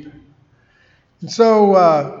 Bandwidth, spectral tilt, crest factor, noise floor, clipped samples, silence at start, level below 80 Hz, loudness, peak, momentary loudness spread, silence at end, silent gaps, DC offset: 7.6 kHz; -6 dB/octave; 16 dB; -55 dBFS; under 0.1%; 0.05 s; -64 dBFS; -12 LUFS; 0 dBFS; 18 LU; 0 s; none; under 0.1%